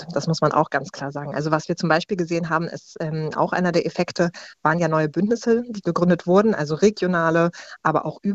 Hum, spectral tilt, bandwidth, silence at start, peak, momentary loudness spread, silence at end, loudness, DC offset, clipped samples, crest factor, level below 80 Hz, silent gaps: none; -6.5 dB/octave; 8 kHz; 0 s; -4 dBFS; 8 LU; 0 s; -22 LUFS; under 0.1%; under 0.1%; 18 dB; -58 dBFS; none